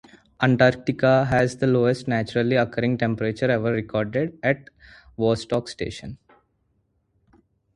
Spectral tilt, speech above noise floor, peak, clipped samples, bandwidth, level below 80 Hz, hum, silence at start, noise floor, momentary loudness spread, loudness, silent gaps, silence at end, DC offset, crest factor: -7 dB/octave; 47 dB; -2 dBFS; under 0.1%; 11 kHz; -52 dBFS; none; 0.4 s; -69 dBFS; 11 LU; -22 LUFS; none; 1.6 s; under 0.1%; 20 dB